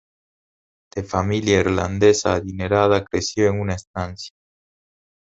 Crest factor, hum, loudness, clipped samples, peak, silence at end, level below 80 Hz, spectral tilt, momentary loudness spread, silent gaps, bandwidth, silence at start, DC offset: 20 dB; none; -20 LUFS; under 0.1%; -2 dBFS; 0.95 s; -40 dBFS; -5 dB/octave; 14 LU; 3.87-3.94 s; 8 kHz; 0.95 s; under 0.1%